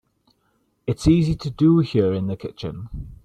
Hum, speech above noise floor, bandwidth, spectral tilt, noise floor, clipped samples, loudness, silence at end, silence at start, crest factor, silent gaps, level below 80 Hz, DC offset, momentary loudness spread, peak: none; 47 dB; 9.6 kHz; -8 dB/octave; -67 dBFS; under 0.1%; -21 LUFS; 0.1 s; 0.85 s; 18 dB; none; -40 dBFS; under 0.1%; 15 LU; -4 dBFS